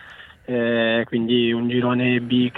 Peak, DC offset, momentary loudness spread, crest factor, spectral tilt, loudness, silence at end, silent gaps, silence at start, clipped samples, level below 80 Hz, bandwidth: -6 dBFS; under 0.1%; 5 LU; 14 dB; -8.5 dB/octave; -20 LUFS; 0 s; none; 0 s; under 0.1%; -58 dBFS; 4.1 kHz